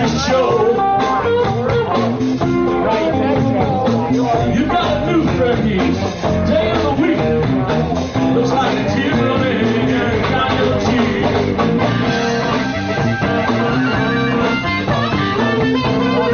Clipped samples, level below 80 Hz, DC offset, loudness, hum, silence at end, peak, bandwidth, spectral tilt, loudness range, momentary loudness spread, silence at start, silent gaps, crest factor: under 0.1%; -36 dBFS; under 0.1%; -16 LUFS; none; 0 s; -4 dBFS; 6.8 kHz; -5 dB/octave; 1 LU; 2 LU; 0 s; none; 12 dB